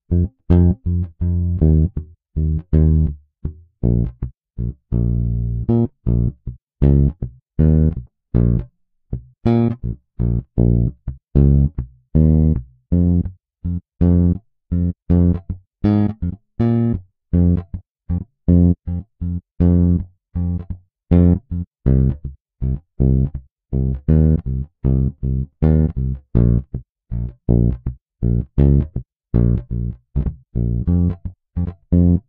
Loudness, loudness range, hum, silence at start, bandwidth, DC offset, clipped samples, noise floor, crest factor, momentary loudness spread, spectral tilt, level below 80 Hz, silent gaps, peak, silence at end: -19 LUFS; 2 LU; none; 0.1 s; 3.6 kHz; under 0.1%; under 0.1%; -44 dBFS; 16 dB; 15 LU; -13.5 dB/octave; -24 dBFS; 6.63-6.67 s, 17.91-17.95 s, 21.67-21.71 s, 22.40-22.45 s, 23.51-23.56 s, 28.01-28.06 s; -2 dBFS; 0.1 s